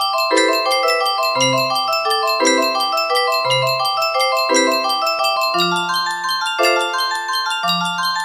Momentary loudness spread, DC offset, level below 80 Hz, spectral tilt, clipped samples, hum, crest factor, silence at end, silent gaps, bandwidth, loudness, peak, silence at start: 4 LU; under 0.1%; -70 dBFS; -2 dB/octave; under 0.1%; none; 16 dB; 0 s; none; 15.5 kHz; -16 LUFS; -2 dBFS; 0 s